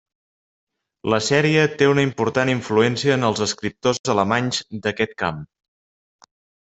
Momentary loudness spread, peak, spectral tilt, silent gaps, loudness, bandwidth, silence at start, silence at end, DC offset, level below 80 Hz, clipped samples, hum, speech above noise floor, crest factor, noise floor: 8 LU; -2 dBFS; -5 dB/octave; 3.99-4.04 s; -20 LUFS; 8.4 kHz; 1.05 s; 1.15 s; under 0.1%; -58 dBFS; under 0.1%; none; over 70 dB; 20 dB; under -90 dBFS